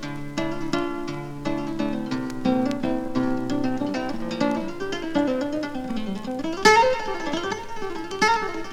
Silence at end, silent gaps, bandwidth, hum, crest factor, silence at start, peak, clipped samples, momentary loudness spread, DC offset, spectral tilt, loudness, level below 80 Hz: 0 s; none; 16 kHz; none; 20 dB; 0 s; -4 dBFS; under 0.1%; 10 LU; under 0.1%; -4.5 dB/octave; -25 LUFS; -44 dBFS